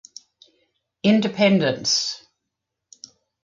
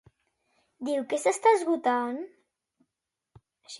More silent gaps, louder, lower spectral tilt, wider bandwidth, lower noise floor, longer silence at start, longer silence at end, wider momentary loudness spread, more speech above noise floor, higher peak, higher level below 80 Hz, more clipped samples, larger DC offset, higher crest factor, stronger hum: neither; first, -20 LUFS vs -26 LUFS; about the same, -4 dB/octave vs -3 dB/octave; second, 7.6 kHz vs 11.5 kHz; second, -82 dBFS vs -87 dBFS; first, 1.05 s vs 0.8 s; first, 1.25 s vs 0 s; second, 9 LU vs 16 LU; about the same, 63 dB vs 61 dB; first, -6 dBFS vs -10 dBFS; first, -66 dBFS vs -76 dBFS; neither; neither; about the same, 18 dB vs 20 dB; neither